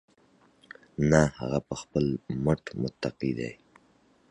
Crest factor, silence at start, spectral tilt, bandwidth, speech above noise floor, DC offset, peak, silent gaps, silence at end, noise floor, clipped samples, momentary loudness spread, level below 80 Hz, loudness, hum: 24 dB; 1 s; -6.5 dB/octave; 10.5 kHz; 36 dB; under 0.1%; -6 dBFS; none; 0.75 s; -63 dBFS; under 0.1%; 12 LU; -50 dBFS; -29 LUFS; none